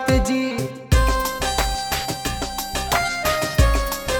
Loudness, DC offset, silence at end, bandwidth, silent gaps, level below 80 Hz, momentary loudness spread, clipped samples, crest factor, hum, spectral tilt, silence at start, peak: -21 LUFS; under 0.1%; 0 s; 19.5 kHz; none; -24 dBFS; 6 LU; under 0.1%; 16 dB; none; -4 dB/octave; 0 s; -4 dBFS